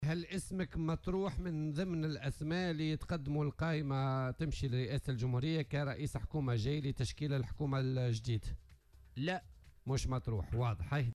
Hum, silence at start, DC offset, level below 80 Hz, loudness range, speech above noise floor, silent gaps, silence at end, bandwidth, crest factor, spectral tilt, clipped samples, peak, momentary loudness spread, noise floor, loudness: none; 0 s; under 0.1%; -50 dBFS; 2 LU; 24 dB; none; 0 s; 12.5 kHz; 10 dB; -6.5 dB/octave; under 0.1%; -26 dBFS; 4 LU; -61 dBFS; -38 LUFS